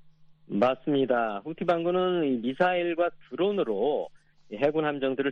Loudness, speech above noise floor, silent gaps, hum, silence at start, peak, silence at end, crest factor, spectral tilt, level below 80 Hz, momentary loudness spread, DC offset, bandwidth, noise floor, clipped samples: -27 LUFS; 27 dB; none; none; 0.05 s; -10 dBFS; 0 s; 18 dB; -8 dB/octave; -66 dBFS; 6 LU; under 0.1%; 6.6 kHz; -54 dBFS; under 0.1%